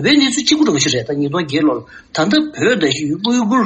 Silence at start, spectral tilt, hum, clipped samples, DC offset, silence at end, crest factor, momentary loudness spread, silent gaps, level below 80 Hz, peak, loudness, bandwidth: 0 s; -4 dB/octave; none; under 0.1%; under 0.1%; 0 s; 14 dB; 6 LU; none; -54 dBFS; 0 dBFS; -15 LUFS; 8.8 kHz